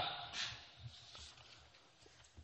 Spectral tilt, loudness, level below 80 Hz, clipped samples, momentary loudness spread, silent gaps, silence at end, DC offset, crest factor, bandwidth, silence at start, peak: -1.5 dB/octave; -47 LUFS; -70 dBFS; under 0.1%; 21 LU; none; 0 s; under 0.1%; 22 dB; 8.4 kHz; 0 s; -28 dBFS